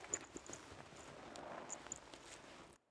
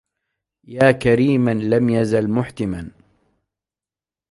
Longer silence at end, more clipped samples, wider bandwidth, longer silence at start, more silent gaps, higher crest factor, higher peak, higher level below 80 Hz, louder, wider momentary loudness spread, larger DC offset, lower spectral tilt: second, 0.15 s vs 1.45 s; neither; about the same, 11 kHz vs 11.5 kHz; second, 0 s vs 0.7 s; neither; first, 28 dB vs 18 dB; second, -24 dBFS vs -2 dBFS; second, -74 dBFS vs -48 dBFS; second, -52 LUFS vs -18 LUFS; second, 10 LU vs 14 LU; neither; second, -2 dB/octave vs -7.5 dB/octave